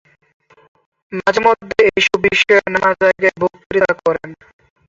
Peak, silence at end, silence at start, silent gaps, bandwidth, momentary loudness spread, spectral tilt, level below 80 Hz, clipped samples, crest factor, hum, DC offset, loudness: -2 dBFS; 0.55 s; 1.1 s; 3.66-3.70 s; 7.8 kHz; 9 LU; -4 dB/octave; -50 dBFS; under 0.1%; 16 dB; none; under 0.1%; -14 LUFS